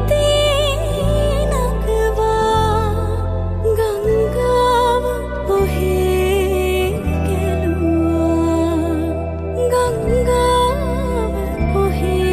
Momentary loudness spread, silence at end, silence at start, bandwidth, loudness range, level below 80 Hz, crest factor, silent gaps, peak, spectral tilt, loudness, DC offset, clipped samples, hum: 6 LU; 0 s; 0 s; 15.5 kHz; 1 LU; -24 dBFS; 12 dB; none; -4 dBFS; -6 dB/octave; -17 LUFS; under 0.1%; under 0.1%; none